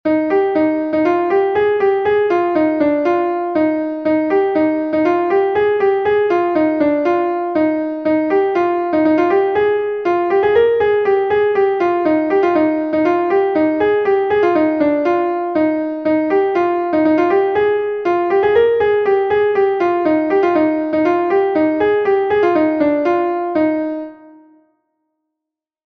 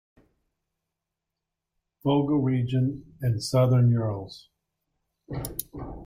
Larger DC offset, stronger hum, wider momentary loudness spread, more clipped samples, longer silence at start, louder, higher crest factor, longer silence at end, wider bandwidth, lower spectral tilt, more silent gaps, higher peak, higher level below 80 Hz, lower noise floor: neither; neither; second, 4 LU vs 15 LU; neither; second, 0.05 s vs 2.05 s; first, -15 LUFS vs -26 LUFS; about the same, 12 dB vs 16 dB; first, 1.6 s vs 0 s; second, 6.2 kHz vs 16 kHz; about the same, -7.5 dB/octave vs -7.5 dB/octave; neither; first, -2 dBFS vs -12 dBFS; about the same, -52 dBFS vs -52 dBFS; about the same, -83 dBFS vs -86 dBFS